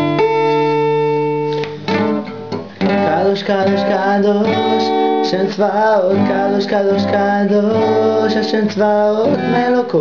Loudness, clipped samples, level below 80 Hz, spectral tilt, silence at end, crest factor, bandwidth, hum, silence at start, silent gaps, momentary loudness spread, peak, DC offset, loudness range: -15 LUFS; under 0.1%; -58 dBFS; -7 dB/octave; 0 s; 10 dB; 7 kHz; none; 0 s; none; 4 LU; -4 dBFS; 0.5%; 2 LU